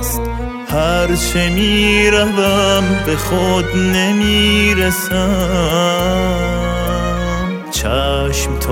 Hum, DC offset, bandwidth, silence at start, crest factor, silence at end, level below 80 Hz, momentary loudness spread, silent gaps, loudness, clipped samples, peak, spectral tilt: none; under 0.1%; 16.5 kHz; 0 s; 14 dB; 0 s; -24 dBFS; 8 LU; none; -14 LUFS; under 0.1%; 0 dBFS; -4.5 dB/octave